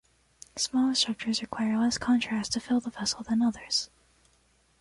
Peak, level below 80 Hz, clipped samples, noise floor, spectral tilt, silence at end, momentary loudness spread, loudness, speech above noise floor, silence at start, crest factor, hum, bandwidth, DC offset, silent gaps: -12 dBFS; -60 dBFS; under 0.1%; -66 dBFS; -3 dB/octave; 0.95 s; 6 LU; -28 LUFS; 38 dB; 0.55 s; 18 dB; none; 11.5 kHz; under 0.1%; none